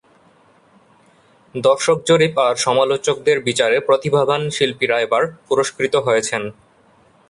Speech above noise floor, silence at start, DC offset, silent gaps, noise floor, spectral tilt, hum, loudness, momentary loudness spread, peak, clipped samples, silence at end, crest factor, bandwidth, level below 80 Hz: 36 dB; 1.55 s; under 0.1%; none; -53 dBFS; -3.5 dB/octave; none; -17 LUFS; 5 LU; -2 dBFS; under 0.1%; 0.8 s; 16 dB; 11.5 kHz; -60 dBFS